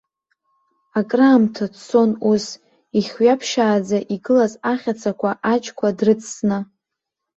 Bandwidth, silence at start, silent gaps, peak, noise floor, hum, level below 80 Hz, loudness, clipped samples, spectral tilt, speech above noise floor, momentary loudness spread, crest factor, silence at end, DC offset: 8.2 kHz; 0.95 s; none; -2 dBFS; -82 dBFS; none; -62 dBFS; -19 LUFS; under 0.1%; -5.5 dB/octave; 64 dB; 9 LU; 16 dB; 0.75 s; under 0.1%